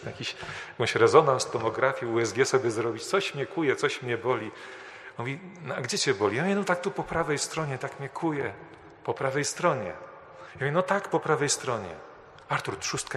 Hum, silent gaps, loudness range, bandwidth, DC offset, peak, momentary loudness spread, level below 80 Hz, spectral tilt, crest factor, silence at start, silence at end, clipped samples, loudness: none; none; 5 LU; 13 kHz; under 0.1%; -4 dBFS; 14 LU; -62 dBFS; -4 dB/octave; 24 dB; 0 s; 0 s; under 0.1%; -28 LUFS